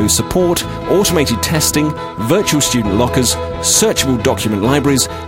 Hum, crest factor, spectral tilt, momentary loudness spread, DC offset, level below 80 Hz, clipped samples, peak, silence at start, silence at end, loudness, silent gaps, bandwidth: none; 14 dB; -3.5 dB/octave; 5 LU; 0.2%; -32 dBFS; under 0.1%; 0 dBFS; 0 s; 0 s; -14 LUFS; none; 16.5 kHz